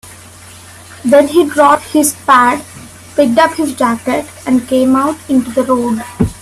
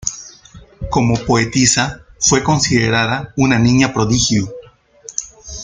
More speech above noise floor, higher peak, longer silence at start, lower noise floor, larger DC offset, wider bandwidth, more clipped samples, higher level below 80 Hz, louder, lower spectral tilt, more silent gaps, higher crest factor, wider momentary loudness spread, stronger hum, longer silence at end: about the same, 24 dB vs 27 dB; about the same, 0 dBFS vs 0 dBFS; about the same, 0.05 s vs 0 s; second, -35 dBFS vs -41 dBFS; neither; first, 15 kHz vs 9.6 kHz; neither; about the same, -40 dBFS vs -38 dBFS; first, -12 LUFS vs -15 LUFS; about the same, -4.5 dB/octave vs -4 dB/octave; neither; about the same, 12 dB vs 16 dB; second, 9 LU vs 13 LU; neither; about the same, 0.05 s vs 0 s